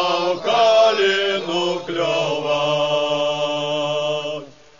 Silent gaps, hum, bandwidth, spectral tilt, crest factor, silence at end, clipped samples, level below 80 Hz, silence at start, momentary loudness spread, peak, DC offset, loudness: none; none; 7.4 kHz; -3.5 dB/octave; 14 dB; 0.3 s; under 0.1%; -64 dBFS; 0 s; 8 LU; -4 dBFS; 0.4%; -19 LUFS